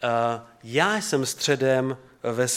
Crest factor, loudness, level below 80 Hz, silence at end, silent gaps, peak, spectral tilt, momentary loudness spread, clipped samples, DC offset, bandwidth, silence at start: 20 dB; -24 LUFS; -68 dBFS; 0 s; none; -6 dBFS; -3.5 dB/octave; 9 LU; under 0.1%; under 0.1%; 16.5 kHz; 0 s